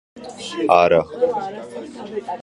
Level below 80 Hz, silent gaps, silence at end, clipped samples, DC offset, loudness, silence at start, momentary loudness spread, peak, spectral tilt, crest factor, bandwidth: -54 dBFS; none; 0 s; under 0.1%; under 0.1%; -18 LUFS; 0.15 s; 19 LU; 0 dBFS; -5 dB/octave; 20 dB; 11 kHz